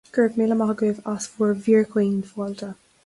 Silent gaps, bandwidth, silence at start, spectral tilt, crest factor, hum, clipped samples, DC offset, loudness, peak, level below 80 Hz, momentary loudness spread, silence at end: none; 11.5 kHz; 0.15 s; -6.5 dB/octave; 16 dB; none; under 0.1%; under 0.1%; -22 LUFS; -6 dBFS; -64 dBFS; 12 LU; 0.3 s